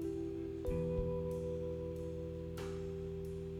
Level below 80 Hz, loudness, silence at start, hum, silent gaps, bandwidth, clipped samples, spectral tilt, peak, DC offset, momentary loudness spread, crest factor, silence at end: -50 dBFS; -41 LUFS; 0 s; none; none; 15.5 kHz; under 0.1%; -8.5 dB/octave; -24 dBFS; under 0.1%; 6 LU; 16 dB; 0 s